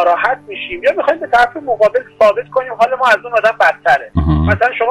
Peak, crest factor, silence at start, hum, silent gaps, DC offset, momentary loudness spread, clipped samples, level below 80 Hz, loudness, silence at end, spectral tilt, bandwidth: -2 dBFS; 10 dB; 0 s; none; none; under 0.1%; 5 LU; under 0.1%; -32 dBFS; -13 LUFS; 0 s; -6.5 dB/octave; 13 kHz